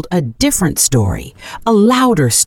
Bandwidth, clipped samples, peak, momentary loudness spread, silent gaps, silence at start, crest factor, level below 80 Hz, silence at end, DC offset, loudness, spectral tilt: 19 kHz; under 0.1%; 0 dBFS; 11 LU; none; 0.05 s; 12 dB; -34 dBFS; 0 s; under 0.1%; -13 LUFS; -4.5 dB/octave